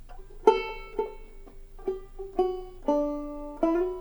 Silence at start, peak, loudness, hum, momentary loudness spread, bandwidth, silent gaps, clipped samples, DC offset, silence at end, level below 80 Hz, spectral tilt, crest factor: 0 s; -6 dBFS; -29 LUFS; none; 14 LU; over 20 kHz; none; under 0.1%; under 0.1%; 0 s; -44 dBFS; -6 dB/octave; 24 dB